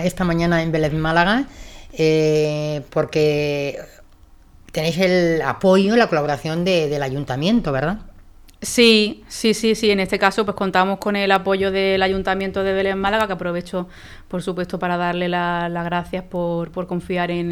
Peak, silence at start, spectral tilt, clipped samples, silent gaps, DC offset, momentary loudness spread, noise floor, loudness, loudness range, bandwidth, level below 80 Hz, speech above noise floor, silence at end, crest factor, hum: 0 dBFS; 0 s; -5 dB/octave; under 0.1%; none; under 0.1%; 10 LU; -47 dBFS; -19 LUFS; 5 LU; 17.5 kHz; -42 dBFS; 28 dB; 0 s; 20 dB; none